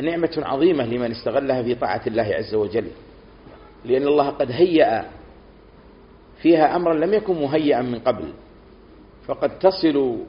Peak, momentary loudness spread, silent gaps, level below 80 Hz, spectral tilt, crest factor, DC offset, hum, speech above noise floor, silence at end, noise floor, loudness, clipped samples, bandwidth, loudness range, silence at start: -2 dBFS; 10 LU; none; -50 dBFS; -5 dB/octave; 20 dB; under 0.1%; none; 27 dB; 0 s; -47 dBFS; -20 LUFS; under 0.1%; 5.4 kHz; 3 LU; 0 s